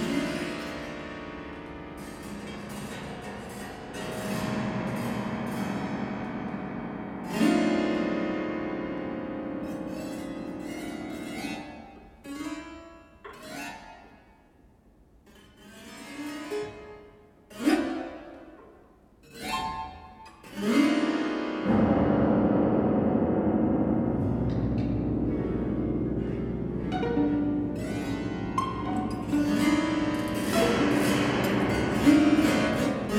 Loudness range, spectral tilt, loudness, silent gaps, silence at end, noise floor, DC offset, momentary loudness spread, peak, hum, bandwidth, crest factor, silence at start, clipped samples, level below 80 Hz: 16 LU; -6 dB/octave; -28 LUFS; none; 0 s; -58 dBFS; under 0.1%; 17 LU; -8 dBFS; none; 16.5 kHz; 20 dB; 0 s; under 0.1%; -46 dBFS